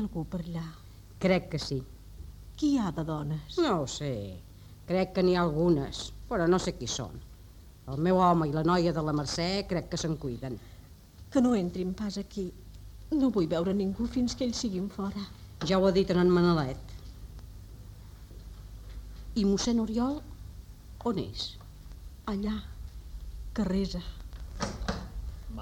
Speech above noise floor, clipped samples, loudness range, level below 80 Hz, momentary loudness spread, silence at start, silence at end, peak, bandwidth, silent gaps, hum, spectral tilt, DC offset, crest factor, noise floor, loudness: 22 dB; under 0.1%; 7 LU; -46 dBFS; 22 LU; 0 s; 0 s; -12 dBFS; 16.5 kHz; none; none; -6 dB/octave; under 0.1%; 20 dB; -51 dBFS; -30 LUFS